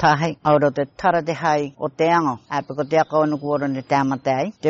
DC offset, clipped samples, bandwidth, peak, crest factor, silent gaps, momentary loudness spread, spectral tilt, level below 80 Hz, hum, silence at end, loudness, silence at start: under 0.1%; under 0.1%; 7.8 kHz; -4 dBFS; 16 dB; none; 5 LU; -5 dB/octave; -56 dBFS; none; 0 s; -20 LUFS; 0 s